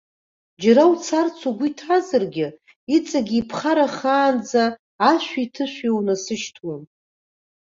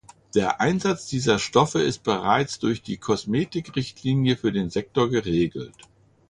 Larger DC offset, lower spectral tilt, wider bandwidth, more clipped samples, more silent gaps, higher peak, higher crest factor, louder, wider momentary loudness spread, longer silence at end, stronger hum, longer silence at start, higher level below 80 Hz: neither; about the same, -4.5 dB/octave vs -5.5 dB/octave; second, 7.8 kHz vs 11 kHz; neither; first, 2.76-2.87 s, 4.79-4.99 s vs none; about the same, -2 dBFS vs -4 dBFS; about the same, 18 dB vs 20 dB; first, -20 LUFS vs -24 LUFS; first, 11 LU vs 7 LU; first, 0.8 s vs 0.6 s; neither; first, 0.6 s vs 0.35 s; second, -64 dBFS vs -52 dBFS